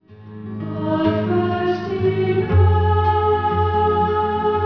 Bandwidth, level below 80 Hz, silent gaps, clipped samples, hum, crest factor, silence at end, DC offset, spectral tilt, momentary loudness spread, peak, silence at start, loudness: 5.4 kHz; -36 dBFS; none; under 0.1%; none; 14 dB; 0 s; 0.3%; -9.5 dB/octave; 9 LU; -4 dBFS; 0.1 s; -19 LUFS